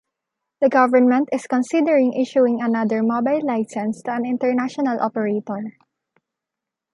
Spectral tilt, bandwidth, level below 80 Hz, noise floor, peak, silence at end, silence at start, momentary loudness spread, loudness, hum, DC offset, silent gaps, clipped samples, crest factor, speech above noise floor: -6.5 dB/octave; 11 kHz; -74 dBFS; -85 dBFS; -2 dBFS; 1.25 s; 0.6 s; 9 LU; -20 LUFS; none; under 0.1%; none; under 0.1%; 18 dB; 66 dB